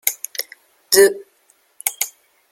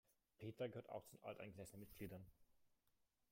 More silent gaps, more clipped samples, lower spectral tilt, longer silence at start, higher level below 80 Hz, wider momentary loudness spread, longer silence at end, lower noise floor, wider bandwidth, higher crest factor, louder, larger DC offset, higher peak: neither; neither; second, -0.5 dB/octave vs -6 dB/octave; about the same, 0.05 s vs 0.1 s; first, -66 dBFS vs -78 dBFS; first, 18 LU vs 8 LU; second, 0.4 s vs 0.65 s; second, -59 dBFS vs -85 dBFS; about the same, 17 kHz vs 16.5 kHz; about the same, 20 dB vs 20 dB; first, -18 LUFS vs -56 LUFS; neither; first, 0 dBFS vs -38 dBFS